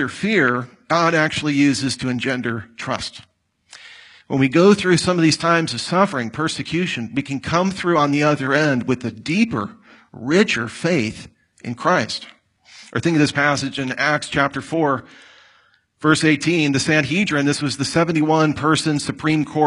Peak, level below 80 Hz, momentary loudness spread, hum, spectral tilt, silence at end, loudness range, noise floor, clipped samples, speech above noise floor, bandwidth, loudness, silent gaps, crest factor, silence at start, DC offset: -2 dBFS; -54 dBFS; 10 LU; none; -5 dB/octave; 0 s; 4 LU; -57 dBFS; under 0.1%; 39 dB; 11.5 kHz; -19 LUFS; none; 18 dB; 0 s; under 0.1%